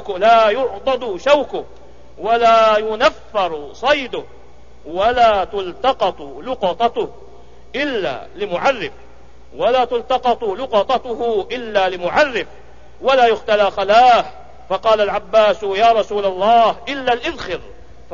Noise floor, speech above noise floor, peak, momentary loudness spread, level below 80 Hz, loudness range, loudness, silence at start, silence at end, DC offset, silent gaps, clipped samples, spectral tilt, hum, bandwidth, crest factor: -44 dBFS; 28 dB; -2 dBFS; 14 LU; -46 dBFS; 6 LU; -16 LUFS; 0 s; 0.4 s; 2%; none; under 0.1%; -4 dB/octave; none; 7.4 kHz; 16 dB